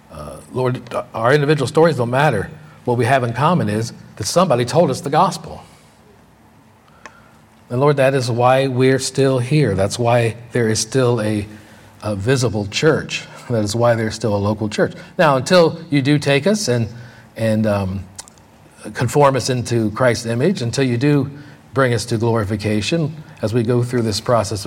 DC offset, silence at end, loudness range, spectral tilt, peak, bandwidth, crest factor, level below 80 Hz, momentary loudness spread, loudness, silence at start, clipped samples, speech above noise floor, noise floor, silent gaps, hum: under 0.1%; 0 s; 4 LU; -5.5 dB/octave; 0 dBFS; 16 kHz; 16 dB; -52 dBFS; 11 LU; -17 LUFS; 0.1 s; under 0.1%; 32 dB; -49 dBFS; none; none